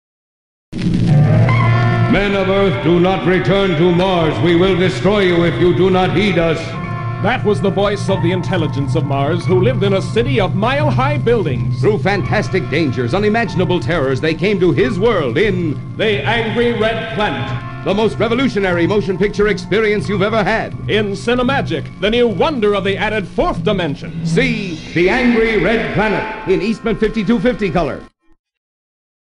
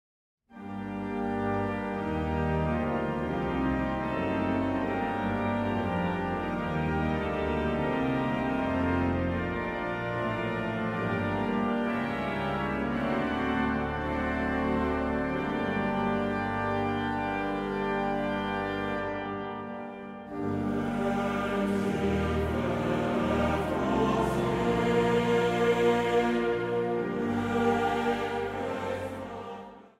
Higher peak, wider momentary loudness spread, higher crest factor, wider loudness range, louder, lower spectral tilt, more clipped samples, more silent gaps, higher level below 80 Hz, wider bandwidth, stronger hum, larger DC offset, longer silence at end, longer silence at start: first, -2 dBFS vs -14 dBFS; about the same, 6 LU vs 7 LU; about the same, 12 dB vs 16 dB; about the same, 3 LU vs 5 LU; first, -15 LUFS vs -29 LUFS; about the same, -7 dB/octave vs -7 dB/octave; neither; neither; first, -32 dBFS vs -46 dBFS; second, 10.5 kHz vs 14.5 kHz; neither; neither; first, 1.2 s vs 0.1 s; first, 0.7 s vs 0.5 s